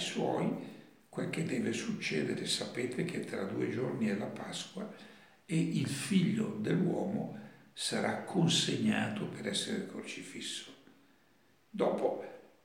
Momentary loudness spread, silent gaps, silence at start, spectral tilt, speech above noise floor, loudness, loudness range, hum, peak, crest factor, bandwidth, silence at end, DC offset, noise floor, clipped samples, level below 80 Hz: 13 LU; none; 0 s; -4.5 dB/octave; 34 dB; -35 LUFS; 5 LU; none; -16 dBFS; 18 dB; 16.5 kHz; 0.15 s; under 0.1%; -69 dBFS; under 0.1%; -82 dBFS